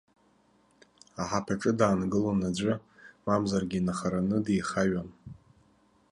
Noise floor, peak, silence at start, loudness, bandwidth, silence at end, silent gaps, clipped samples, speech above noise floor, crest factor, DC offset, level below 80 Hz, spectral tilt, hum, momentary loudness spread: -65 dBFS; -10 dBFS; 1.15 s; -29 LUFS; 11 kHz; 0.8 s; none; under 0.1%; 37 dB; 20 dB; under 0.1%; -56 dBFS; -6 dB/octave; none; 13 LU